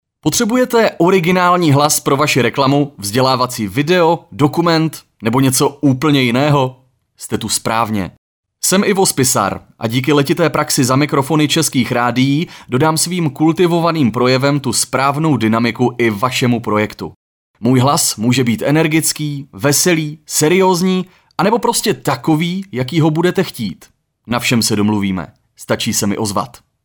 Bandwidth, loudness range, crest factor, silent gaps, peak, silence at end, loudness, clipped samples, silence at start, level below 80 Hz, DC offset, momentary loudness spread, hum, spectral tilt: over 20 kHz; 3 LU; 14 dB; 8.18-8.43 s, 17.16-17.54 s; 0 dBFS; 0.35 s; -14 LUFS; under 0.1%; 0.25 s; -50 dBFS; under 0.1%; 9 LU; none; -4.5 dB/octave